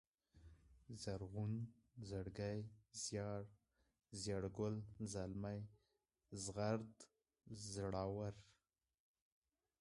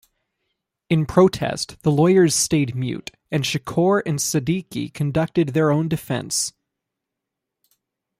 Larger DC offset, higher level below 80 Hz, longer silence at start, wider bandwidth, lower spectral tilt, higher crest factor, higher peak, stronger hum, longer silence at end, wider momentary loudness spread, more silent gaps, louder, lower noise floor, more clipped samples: neither; second, -68 dBFS vs -52 dBFS; second, 0.35 s vs 0.9 s; second, 11.5 kHz vs 15.5 kHz; about the same, -5.5 dB/octave vs -5 dB/octave; about the same, 22 dB vs 18 dB; second, -28 dBFS vs -4 dBFS; neither; second, 1.3 s vs 1.7 s; first, 15 LU vs 10 LU; neither; second, -48 LUFS vs -20 LUFS; first, under -90 dBFS vs -83 dBFS; neither